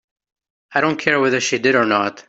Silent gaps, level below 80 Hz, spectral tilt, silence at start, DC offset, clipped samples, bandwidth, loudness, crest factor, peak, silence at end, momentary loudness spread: none; -62 dBFS; -3.5 dB/octave; 0.7 s; under 0.1%; under 0.1%; 8 kHz; -17 LUFS; 18 dB; -2 dBFS; 0.1 s; 4 LU